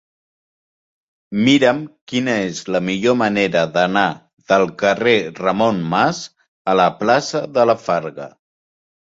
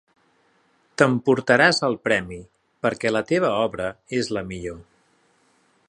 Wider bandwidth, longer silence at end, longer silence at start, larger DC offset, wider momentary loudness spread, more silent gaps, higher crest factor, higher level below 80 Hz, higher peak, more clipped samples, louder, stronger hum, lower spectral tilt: second, 8 kHz vs 11.5 kHz; second, 0.9 s vs 1.05 s; first, 1.3 s vs 1 s; neither; second, 12 LU vs 19 LU; first, 2.01-2.07 s, 4.33-4.37 s, 6.48-6.65 s vs none; second, 16 dB vs 22 dB; about the same, -58 dBFS vs -54 dBFS; about the same, -2 dBFS vs 0 dBFS; neither; first, -17 LUFS vs -21 LUFS; neither; about the same, -5 dB/octave vs -5 dB/octave